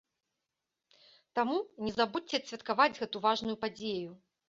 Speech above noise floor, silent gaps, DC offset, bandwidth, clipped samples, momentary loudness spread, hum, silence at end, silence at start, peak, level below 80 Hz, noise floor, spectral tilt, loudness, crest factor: 55 dB; none; under 0.1%; 7.6 kHz; under 0.1%; 9 LU; none; 0.35 s; 1.35 s; -12 dBFS; -70 dBFS; -88 dBFS; -1.5 dB/octave; -33 LUFS; 22 dB